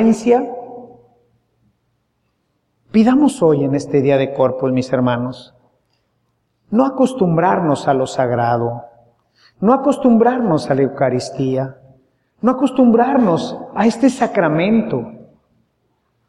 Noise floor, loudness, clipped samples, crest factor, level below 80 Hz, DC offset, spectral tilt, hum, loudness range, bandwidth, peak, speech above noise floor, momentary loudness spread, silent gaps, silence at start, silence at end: -67 dBFS; -16 LUFS; under 0.1%; 16 dB; -56 dBFS; under 0.1%; -7 dB/octave; none; 3 LU; 11.5 kHz; 0 dBFS; 52 dB; 11 LU; none; 0 s; 1.05 s